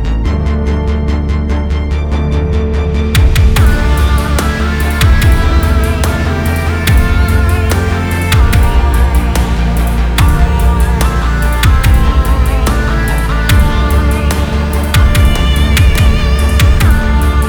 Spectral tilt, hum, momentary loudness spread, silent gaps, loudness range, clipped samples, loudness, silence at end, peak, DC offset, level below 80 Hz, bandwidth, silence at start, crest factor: -5.5 dB/octave; none; 5 LU; none; 1 LU; under 0.1%; -12 LUFS; 0 s; 0 dBFS; under 0.1%; -10 dBFS; over 20 kHz; 0 s; 10 dB